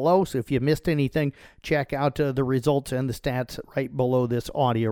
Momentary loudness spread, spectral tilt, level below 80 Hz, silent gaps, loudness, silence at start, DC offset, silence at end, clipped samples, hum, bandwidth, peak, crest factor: 7 LU; -7 dB/octave; -48 dBFS; none; -25 LUFS; 0 s; under 0.1%; 0 s; under 0.1%; none; 18.5 kHz; -8 dBFS; 16 dB